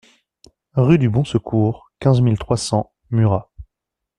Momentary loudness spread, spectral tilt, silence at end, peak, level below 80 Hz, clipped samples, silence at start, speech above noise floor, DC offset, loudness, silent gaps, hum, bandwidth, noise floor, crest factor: 8 LU; -7.5 dB/octave; 0.55 s; -2 dBFS; -44 dBFS; under 0.1%; 0.75 s; 66 dB; under 0.1%; -18 LUFS; none; none; 11 kHz; -82 dBFS; 16 dB